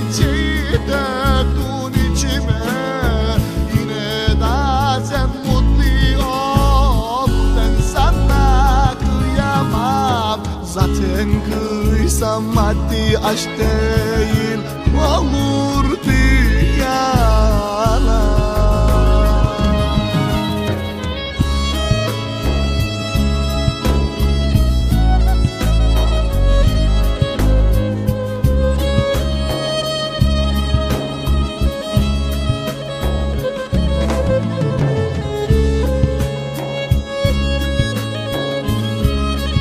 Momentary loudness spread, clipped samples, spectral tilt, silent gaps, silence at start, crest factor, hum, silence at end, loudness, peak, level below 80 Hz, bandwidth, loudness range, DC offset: 5 LU; under 0.1%; -6 dB/octave; none; 0 s; 14 dB; none; 0 s; -17 LUFS; 0 dBFS; -18 dBFS; 15.5 kHz; 3 LU; under 0.1%